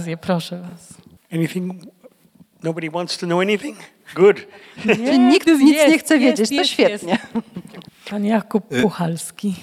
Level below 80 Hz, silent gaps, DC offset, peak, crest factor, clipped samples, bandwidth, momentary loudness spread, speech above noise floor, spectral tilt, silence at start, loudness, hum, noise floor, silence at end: -62 dBFS; none; under 0.1%; -2 dBFS; 18 dB; under 0.1%; 15 kHz; 18 LU; 34 dB; -5 dB/octave; 0 s; -18 LUFS; none; -52 dBFS; 0 s